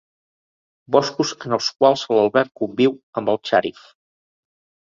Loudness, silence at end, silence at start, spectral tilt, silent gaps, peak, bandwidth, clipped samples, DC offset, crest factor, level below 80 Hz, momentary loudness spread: -19 LUFS; 1.15 s; 0.9 s; -4.5 dB/octave; 3.03-3.13 s; 0 dBFS; 7.6 kHz; under 0.1%; under 0.1%; 20 dB; -64 dBFS; 7 LU